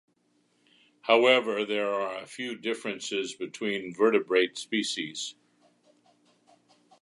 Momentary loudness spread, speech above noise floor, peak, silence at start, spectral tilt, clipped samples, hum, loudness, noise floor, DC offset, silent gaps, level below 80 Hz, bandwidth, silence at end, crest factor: 13 LU; 43 dB; -6 dBFS; 1.05 s; -3 dB/octave; under 0.1%; none; -28 LUFS; -70 dBFS; under 0.1%; none; -82 dBFS; 11.5 kHz; 1.7 s; 24 dB